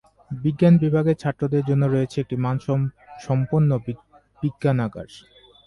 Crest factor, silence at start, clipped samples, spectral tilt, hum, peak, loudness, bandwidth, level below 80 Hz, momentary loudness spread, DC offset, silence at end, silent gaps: 16 dB; 0.3 s; under 0.1%; -9 dB/octave; none; -6 dBFS; -22 LUFS; 11 kHz; -52 dBFS; 18 LU; under 0.1%; 0.5 s; none